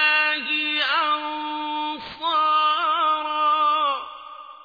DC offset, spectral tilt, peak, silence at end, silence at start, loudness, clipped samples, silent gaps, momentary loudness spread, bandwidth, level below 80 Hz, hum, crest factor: under 0.1%; -2.5 dB/octave; -8 dBFS; 0 s; 0 s; -21 LUFS; under 0.1%; none; 11 LU; 5 kHz; -66 dBFS; none; 16 dB